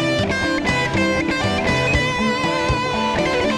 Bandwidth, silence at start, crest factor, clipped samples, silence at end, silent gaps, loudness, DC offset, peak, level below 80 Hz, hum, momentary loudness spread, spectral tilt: 13 kHz; 0 s; 14 dB; under 0.1%; 0 s; none; -19 LUFS; under 0.1%; -6 dBFS; -34 dBFS; none; 2 LU; -5 dB/octave